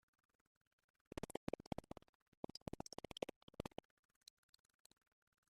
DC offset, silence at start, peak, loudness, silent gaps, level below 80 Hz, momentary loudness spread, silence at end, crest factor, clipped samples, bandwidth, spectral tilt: under 0.1%; 1.15 s; -26 dBFS; -53 LUFS; 1.37-1.47 s, 1.67-1.71 s, 2.09-2.43 s, 2.62-2.66 s, 3.36-3.48 s; -70 dBFS; 16 LU; 1.9 s; 28 dB; under 0.1%; 14.5 kHz; -5 dB/octave